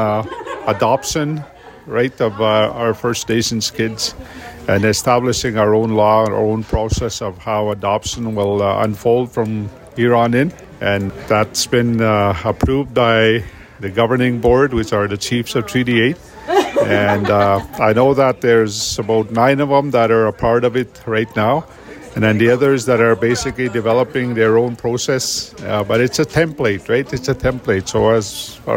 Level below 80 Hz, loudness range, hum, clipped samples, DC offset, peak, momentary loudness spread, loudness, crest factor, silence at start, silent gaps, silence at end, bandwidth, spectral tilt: -38 dBFS; 3 LU; none; under 0.1%; under 0.1%; 0 dBFS; 8 LU; -16 LUFS; 14 dB; 0 s; none; 0 s; 16.5 kHz; -5 dB/octave